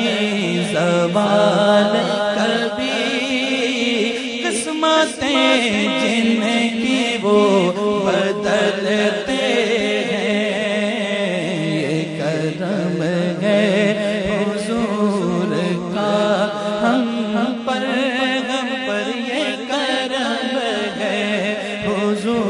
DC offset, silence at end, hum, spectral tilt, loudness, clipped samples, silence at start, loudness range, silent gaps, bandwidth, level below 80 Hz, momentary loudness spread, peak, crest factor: under 0.1%; 0 s; none; -4.5 dB/octave; -18 LUFS; under 0.1%; 0 s; 4 LU; none; 11 kHz; -56 dBFS; 6 LU; -2 dBFS; 16 dB